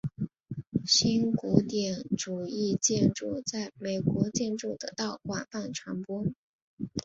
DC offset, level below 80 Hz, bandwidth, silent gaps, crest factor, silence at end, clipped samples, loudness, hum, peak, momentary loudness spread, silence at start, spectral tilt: under 0.1%; -60 dBFS; 8 kHz; 0.67-0.71 s, 6.36-6.77 s; 24 dB; 0.05 s; under 0.1%; -30 LUFS; none; -6 dBFS; 12 LU; 0.05 s; -4.5 dB/octave